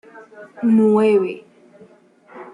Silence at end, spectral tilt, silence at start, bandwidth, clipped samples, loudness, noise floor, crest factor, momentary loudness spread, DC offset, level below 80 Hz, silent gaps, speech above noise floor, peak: 0.1 s; -8.5 dB/octave; 0.15 s; 10.5 kHz; under 0.1%; -16 LUFS; -50 dBFS; 14 dB; 13 LU; under 0.1%; -70 dBFS; none; 33 dB; -6 dBFS